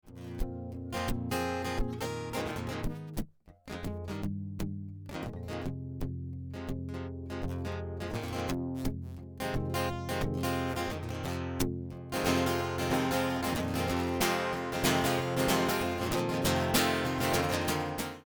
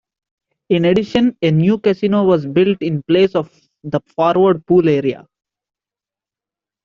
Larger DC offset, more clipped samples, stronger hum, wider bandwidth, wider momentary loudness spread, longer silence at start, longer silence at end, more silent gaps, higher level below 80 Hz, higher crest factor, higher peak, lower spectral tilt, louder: neither; neither; neither; first, over 20 kHz vs 7 kHz; about the same, 12 LU vs 10 LU; second, 0.05 s vs 0.7 s; second, 0.05 s vs 1.65 s; neither; first, -46 dBFS vs -52 dBFS; about the same, 18 dB vs 14 dB; second, -14 dBFS vs -2 dBFS; second, -4.5 dB/octave vs -8.5 dB/octave; second, -33 LUFS vs -15 LUFS